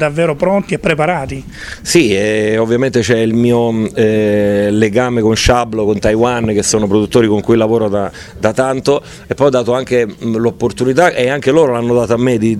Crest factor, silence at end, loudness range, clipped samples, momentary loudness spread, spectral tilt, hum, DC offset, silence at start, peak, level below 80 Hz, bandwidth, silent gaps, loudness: 12 dB; 0 s; 2 LU; under 0.1%; 5 LU; -5.5 dB/octave; none; under 0.1%; 0 s; 0 dBFS; -34 dBFS; 13.5 kHz; none; -13 LUFS